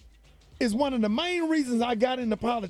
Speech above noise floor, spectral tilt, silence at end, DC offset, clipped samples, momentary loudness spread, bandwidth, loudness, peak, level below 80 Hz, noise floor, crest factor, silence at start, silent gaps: 29 dB; -5 dB/octave; 0 s; under 0.1%; under 0.1%; 3 LU; 12.5 kHz; -27 LUFS; -10 dBFS; -54 dBFS; -55 dBFS; 16 dB; 0.05 s; none